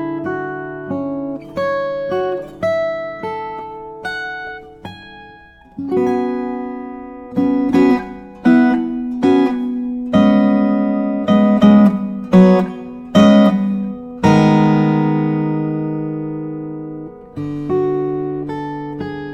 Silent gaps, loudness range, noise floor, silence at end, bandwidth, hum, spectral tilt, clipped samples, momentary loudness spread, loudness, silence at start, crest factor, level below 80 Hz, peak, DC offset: none; 11 LU; -42 dBFS; 0 s; 8 kHz; none; -8 dB/octave; under 0.1%; 17 LU; -16 LUFS; 0 s; 16 dB; -48 dBFS; 0 dBFS; under 0.1%